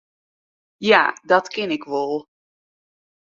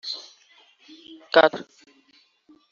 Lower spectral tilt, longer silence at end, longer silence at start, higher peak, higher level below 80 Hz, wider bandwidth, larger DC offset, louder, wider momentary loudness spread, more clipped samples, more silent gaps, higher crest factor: first, -4 dB/octave vs 0 dB/octave; about the same, 1 s vs 1.1 s; first, 0.8 s vs 0.05 s; about the same, 0 dBFS vs -2 dBFS; about the same, -70 dBFS vs -74 dBFS; about the same, 7.6 kHz vs 7.4 kHz; neither; about the same, -20 LUFS vs -21 LUFS; second, 11 LU vs 27 LU; neither; neither; about the same, 22 dB vs 24 dB